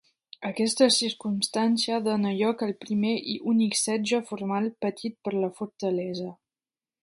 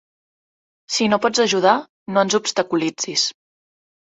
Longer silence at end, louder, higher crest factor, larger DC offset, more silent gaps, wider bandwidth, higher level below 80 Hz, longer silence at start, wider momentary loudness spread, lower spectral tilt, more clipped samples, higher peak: about the same, 0.7 s vs 0.75 s; second, -27 LUFS vs -19 LUFS; about the same, 20 dB vs 20 dB; neither; second, none vs 1.89-2.06 s; first, 11.5 kHz vs 8.4 kHz; second, -74 dBFS vs -66 dBFS; second, 0.4 s vs 0.9 s; first, 10 LU vs 6 LU; about the same, -4 dB/octave vs -3 dB/octave; neither; second, -6 dBFS vs -2 dBFS